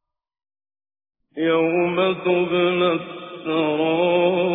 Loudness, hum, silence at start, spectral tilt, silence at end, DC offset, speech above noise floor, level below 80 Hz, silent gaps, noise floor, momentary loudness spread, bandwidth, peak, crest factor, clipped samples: -20 LUFS; none; 1.35 s; -9.5 dB/octave; 0 s; under 0.1%; over 71 dB; -62 dBFS; none; under -90 dBFS; 8 LU; 3.9 kHz; -8 dBFS; 14 dB; under 0.1%